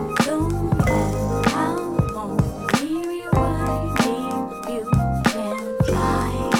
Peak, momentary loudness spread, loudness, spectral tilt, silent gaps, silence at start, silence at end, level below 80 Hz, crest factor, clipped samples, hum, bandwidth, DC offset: -4 dBFS; 6 LU; -22 LUFS; -6 dB/octave; none; 0 s; 0 s; -32 dBFS; 18 dB; under 0.1%; none; 19.5 kHz; under 0.1%